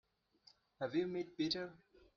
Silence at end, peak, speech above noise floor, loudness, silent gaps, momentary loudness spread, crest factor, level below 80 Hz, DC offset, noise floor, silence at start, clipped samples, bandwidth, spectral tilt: 0.4 s; -26 dBFS; 30 dB; -41 LUFS; none; 7 LU; 18 dB; -76 dBFS; under 0.1%; -71 dBFS; 0.8 s; under 0.1%; 7 kHz; -3.5 dB/octave